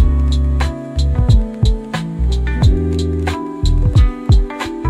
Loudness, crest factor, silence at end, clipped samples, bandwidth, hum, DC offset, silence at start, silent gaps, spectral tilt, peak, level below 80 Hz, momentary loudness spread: -16 LUFS; 12 dB; 0 s; under 0.1%; 10.5 kHz; none; under 0.1%; 0 s; none; -7 dB/octave; -2 dBFS; -16 dBFS; 6 LU